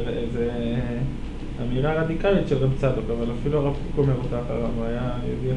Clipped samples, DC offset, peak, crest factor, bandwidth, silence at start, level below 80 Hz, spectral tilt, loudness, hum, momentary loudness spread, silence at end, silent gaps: under 0.1%; under 0.1%; -8 dBFS; 16 dB; 10 kHz; 0 s; -32 dBFS; -8.5 dB/octave; -25 LUFS; none; 7 LU; 0 s; none